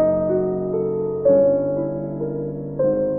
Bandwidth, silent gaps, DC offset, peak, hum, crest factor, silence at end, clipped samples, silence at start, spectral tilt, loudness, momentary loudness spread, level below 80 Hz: 2.4 kHz; none; 0.2%; -6 dBFS; none; 14 dB; 0 s; under 0.1%; 0 s; -14.5 dB/octave; -21 LUFS; 10 LU; -50 dBFS